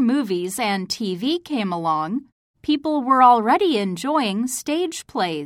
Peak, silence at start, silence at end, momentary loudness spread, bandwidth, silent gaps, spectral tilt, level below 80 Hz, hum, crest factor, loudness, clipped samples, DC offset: -2 dBFS; 0 s; 0 s; 11 LU; 16.5 kHz; 2.32-2.54 s; -4.5 dB/octave; -62 dBFS; none; 18 dB; -21 LUFS; under 0.1%; under 0.1%